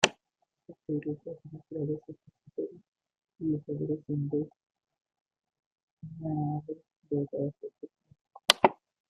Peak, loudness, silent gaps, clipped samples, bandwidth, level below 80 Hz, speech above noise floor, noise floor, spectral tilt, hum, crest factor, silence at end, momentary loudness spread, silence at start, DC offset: -2 dBFS; -32 LUFS; 2.88-2.92 s, 5.21-5.25 s, 5.66-5.76 s, 5.83-5.97 s, 8.21-8.25 s; under 0.1%; 15.5 kHz; -70 dBFS; 46 dB; -81 dBFS; -4 dB/octave; none; 32 dB; 0.4 s; 21 LU; 0 s; under 0.1%